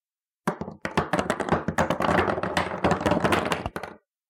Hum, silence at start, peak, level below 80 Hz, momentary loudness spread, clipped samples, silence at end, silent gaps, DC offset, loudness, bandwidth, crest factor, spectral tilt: none; 0.45 s; -6 dBFS; -48 dBFS; 10 LU; under 0.1%; 0.3 s; none; under 0.1%; -26 LUFS; 17 kHz; 20 dB; -5.5 dB/octave